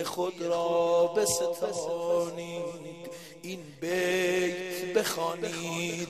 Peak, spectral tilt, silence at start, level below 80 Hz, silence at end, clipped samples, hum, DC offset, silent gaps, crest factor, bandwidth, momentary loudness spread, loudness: -14 dBFS; -3.5 dB/octave; 0 s; -68 dBFS; 0 s; under 0.1%; none; under 0.1%; none; 16 dB; 15.5 kHz; 15 LU; -29 LUFS